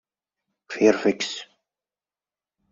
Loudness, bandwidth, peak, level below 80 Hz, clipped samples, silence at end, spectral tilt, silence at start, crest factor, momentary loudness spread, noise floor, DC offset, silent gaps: -22 LUFS; 7.8 kHz; -4 dBFS; -70 dBFS; under 0.1%; 1.3 s; -4 dB/octave; 0.7 s; 22 dB; 17 LU; under -90 dBFS; under 0.1%; none